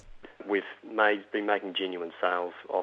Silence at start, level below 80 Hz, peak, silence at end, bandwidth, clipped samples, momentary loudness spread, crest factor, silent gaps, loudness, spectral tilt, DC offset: 0.05 s; -62 dBFS; -8 dBFS; 0 s; 6.2 kHz; under 0.1%; 8 LU; 22 dB; none; -30 LUFS; -5.5 dB/octave; under 0.1%